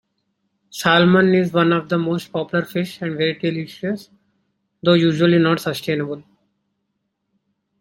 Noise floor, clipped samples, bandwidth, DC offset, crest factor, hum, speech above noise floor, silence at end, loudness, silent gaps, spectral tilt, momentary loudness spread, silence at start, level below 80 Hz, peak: -74 dBFS; under 0.1%; 16.5 kHz; under 0.1%; 18 dB; none; 56 dB; 1.6 s; -18 LUFS; none; -6.5 dB/octave; 12 LU; 0.75 s; -60 dBFS; -2 dBFS